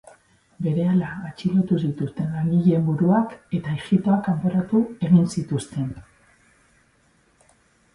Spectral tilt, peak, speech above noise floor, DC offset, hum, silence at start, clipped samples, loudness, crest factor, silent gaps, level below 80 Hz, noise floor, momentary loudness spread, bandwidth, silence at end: -8.5 dB/octave; -6 dBFS; 40 dB; under 0.1%; none; 0.6 s; under 0.1%; -22 LUFS; 16 dB; none; -56 dBFS; -61 dBFS; 10 LU; 11.5 kHz; 1.95 s